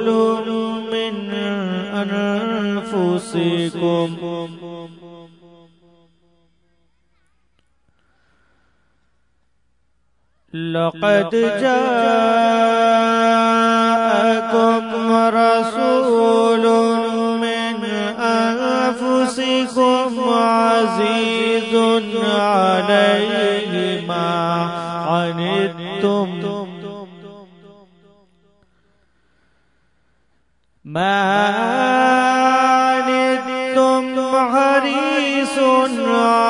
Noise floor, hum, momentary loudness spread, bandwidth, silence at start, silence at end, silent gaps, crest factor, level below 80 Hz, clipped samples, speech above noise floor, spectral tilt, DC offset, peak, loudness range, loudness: -67 dBFS; none; 9 LU; 11 kHz; 0 s; 0 s; none; 16 dB; -64 dBFS; under 0.1%; 51 dB; -5 dB/octave; under 0.1%; -2 dBFS; 10 LU; -17 LUFS